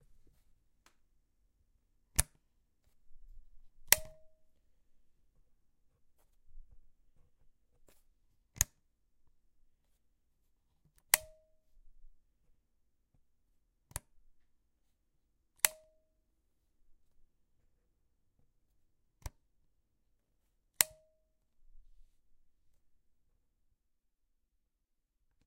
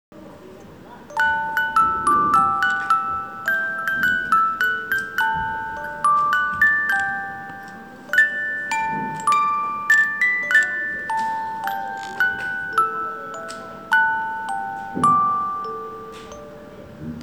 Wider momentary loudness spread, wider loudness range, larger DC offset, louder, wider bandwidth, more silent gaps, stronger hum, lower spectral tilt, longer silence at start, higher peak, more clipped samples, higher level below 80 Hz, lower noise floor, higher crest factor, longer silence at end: first, 23 LU vs 17 LU; first, 7 LU vs 4 LU; second, under 0.1% vs 0.1%; second, -32 LUFS vs -20 LUFS; second, 16 kHz vs over 20 kHz; neither; neither; second, 0 dB/octave vs -3 dB/octave; first, 2.2 s vs 0.1 s; first, -2 dBFS vs -6 dBFS; neither; about the same, -58 dBFS vs -56 dBFS; first, -82 dBFS vs -42 dBFS; first, 44 dB vs 16 dB; first, 3.7 s vs 0 s